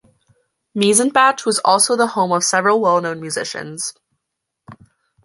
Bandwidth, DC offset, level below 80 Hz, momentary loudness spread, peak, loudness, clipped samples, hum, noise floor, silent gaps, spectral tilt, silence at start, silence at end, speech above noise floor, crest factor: 12 kHz; under 0.1%; -66 dBFS; 12 LU; 0 dBFS; -16 LUFS; under 0.1%; none; -79 dBFS; none; -2.5 dB/octave; 0.75 s; 0.5 s; 62 dB; 18 dB